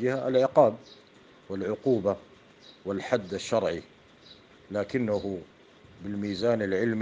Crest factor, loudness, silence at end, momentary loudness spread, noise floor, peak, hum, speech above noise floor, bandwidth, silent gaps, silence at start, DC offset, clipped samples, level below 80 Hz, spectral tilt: 22 dB; -28 LUFS; 0 s; 15 LU; -55 dBFS; -8 dBFS; none; 28 dB; 9.6 kHz; none; 0 s; under 0.1%; under 0.1%; -68 dBFS; -6.5 dB/octave